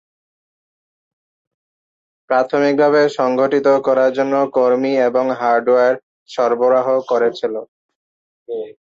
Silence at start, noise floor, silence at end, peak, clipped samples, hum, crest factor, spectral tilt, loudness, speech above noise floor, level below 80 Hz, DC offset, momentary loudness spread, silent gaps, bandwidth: 2.3 s; under -90 dBFS; 0.2 s; -2 dBFS; under 0.1%; none; 14 dB; -6 dB/octave; -16 LUFS; over 75 dB; -68 dBFS; under 0.1%; 12 LU; 6.03-6.26 s, 7.68-7.89 s, 7.95-8.46 s; 7.6 kHz